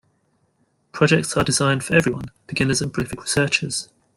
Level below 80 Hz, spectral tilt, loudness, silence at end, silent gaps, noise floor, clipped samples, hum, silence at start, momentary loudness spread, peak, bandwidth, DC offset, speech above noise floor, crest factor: -48 dBFS; -4 dB/octave; -20 LUFS; 0.3 s; none; -66 dBFS; under 0.1%; none; 0.95 s; 10 LU; -2 dBFS; 15.5 kHz; under 0.1%; 45 dB; 20 dB